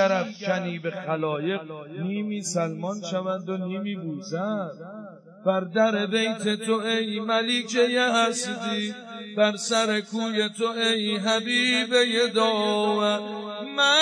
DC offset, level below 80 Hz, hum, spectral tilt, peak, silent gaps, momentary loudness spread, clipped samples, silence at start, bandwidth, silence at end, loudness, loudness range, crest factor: under 0.1%; under -90 dBFS; none; -3.5 dB/octave; -8 dBFS; none; 11 LU; under 0.1%; 0 s; 11 kHz; 0 s; -25 LUFS; 7 LU; 18 dB